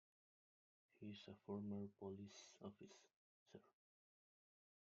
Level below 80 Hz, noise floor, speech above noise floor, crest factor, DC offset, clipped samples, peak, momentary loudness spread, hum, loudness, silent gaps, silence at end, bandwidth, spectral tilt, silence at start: under -90 dBFS; under -90 dBFS; over 35 dB; 20 dB; under 0.1%; under 0.1%; -38 dBFS; 17 LU; none; -56 LUFS; 3.16-3.46 s; 1.25 s; 7.4 kHz; -6.5 dB/octave; 0.95 s